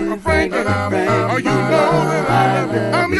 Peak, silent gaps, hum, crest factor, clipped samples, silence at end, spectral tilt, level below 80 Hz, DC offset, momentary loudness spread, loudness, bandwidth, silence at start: -2 dBFS; none; none; 14 dB; under 0.1%; 0 s; -6 dB/octave; -36 dBFS; under 0.1%; 3 LU; -16 LUFS; 12 kHz; 0 s